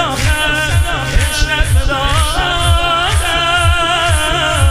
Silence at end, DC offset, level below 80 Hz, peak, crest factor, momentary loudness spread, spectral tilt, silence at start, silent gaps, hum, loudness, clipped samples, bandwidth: 0 s; under 0.1%; -18 dBFS; 0 dBFS; 12 dB; 3 LU; -3.5 dB/octave; 0 s; none; none; -13 LUFS; under 0.1%; 15.5 kHz